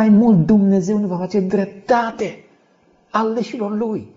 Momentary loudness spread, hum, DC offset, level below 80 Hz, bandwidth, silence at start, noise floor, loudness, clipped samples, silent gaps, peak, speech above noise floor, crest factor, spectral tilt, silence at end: 11 LU; none; under 0.1%; -52 dBFS; 7.6 kHz; 0 s; -56 dBFS; -18 LUFS; under 0.1%; none; -4 dBFS; 40 dB; 14 dB; -7.5 dB/octave; 0.1 s